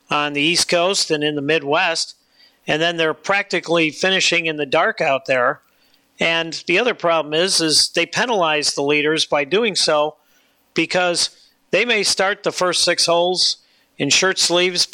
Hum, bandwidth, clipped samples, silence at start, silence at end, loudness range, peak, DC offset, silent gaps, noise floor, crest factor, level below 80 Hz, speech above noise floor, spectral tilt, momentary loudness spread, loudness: none; 17 kHz; under 0.1%; 0.1 s; 0.1 s; 2 LU; -6 dBFS; under 0.1%; none; -59 dBFS; 14 dB; -64 dBFS; 41 dB; -2 dB/octave; 6 LU; -17 LUFS